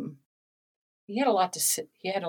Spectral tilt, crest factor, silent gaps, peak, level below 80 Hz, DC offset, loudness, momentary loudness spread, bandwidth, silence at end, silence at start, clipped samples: -2.5 dB/octave; 18 dB; 0.25-1.07 s; -12 dBFS; -86 dBFS; under 0.1%; -27 LUFS; 11 LU; 19.5 kHz; 0 s; 0 s; under 0.1%